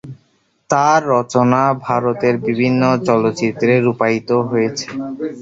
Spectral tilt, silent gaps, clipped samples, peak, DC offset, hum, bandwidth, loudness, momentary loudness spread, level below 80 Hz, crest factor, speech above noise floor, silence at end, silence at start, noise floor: -6 dB/octave; none; under 0.1%; 0 dBFS; under 0.1%; none; 7.8 kHz; -16 LUFS; 6 LU; -56 dBFS; 16 dB; 45 dB; 0 s; 0.05 s; -60 dBFS